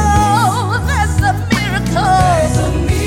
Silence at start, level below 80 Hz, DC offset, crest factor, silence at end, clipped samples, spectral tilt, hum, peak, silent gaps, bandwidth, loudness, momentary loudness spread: 0 s; -24 dBFS; under 0.1%; 12 dB; 0 s; under 0.1%; -5.5 dB/octave; none; -2 dBFS; none; 17 kHz; -14 LUFS; 4 LU